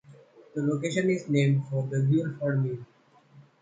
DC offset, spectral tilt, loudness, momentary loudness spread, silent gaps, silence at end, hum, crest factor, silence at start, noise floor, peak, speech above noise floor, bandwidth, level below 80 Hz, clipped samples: under 0.1%; -7.5 dB/octave; -27 LUFS; 8 LU; none; 0.2 s; none; 16 dB; 0.1 s; -56 dBFS; -12 dBFS; 30 dB; 9.2 kHz; -70 dBFS; under 0.1%